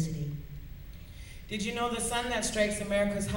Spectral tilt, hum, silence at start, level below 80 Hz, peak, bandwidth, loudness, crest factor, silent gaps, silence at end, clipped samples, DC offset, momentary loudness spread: -4 dB/octave; none; 0 s; -46 dBFS; -14 dBFS; 16.5 kHz; -31 LUFS; 18 dB; none; 0 s; under 0.1%; under 0.1%; 19 LU